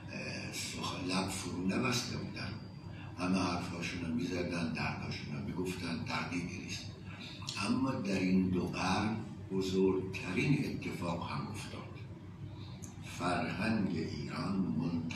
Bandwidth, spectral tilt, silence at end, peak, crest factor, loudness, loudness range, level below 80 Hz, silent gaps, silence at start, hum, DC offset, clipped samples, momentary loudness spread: 14 kHz; -5.5 dB/octave; 0 s; -20 dBFS; 18 dB; -36 LUFS; 5 LU; -60 dBFS; none; 0 s; none; under 0.1%; under 0.1%; 14 LU